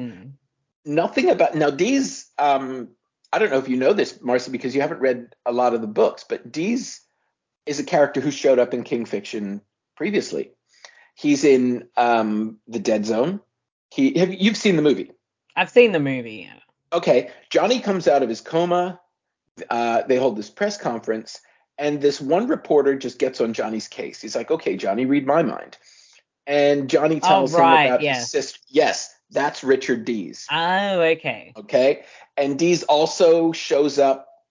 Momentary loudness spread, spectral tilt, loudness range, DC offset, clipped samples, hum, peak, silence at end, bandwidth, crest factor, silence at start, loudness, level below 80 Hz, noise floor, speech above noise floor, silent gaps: 12 LU; -5 dB/octave; 5 LU; under 0.1%; under 0.1%; none; -2 dBFS; 0.3 s; 7.6 kHz; 20 dB; 0 s; -20 LUFS; -70 dBFS; -75 dBFS; 55 dB; 0.76-0.83 s, 13.72-13.89 s, 19.51-19.55 s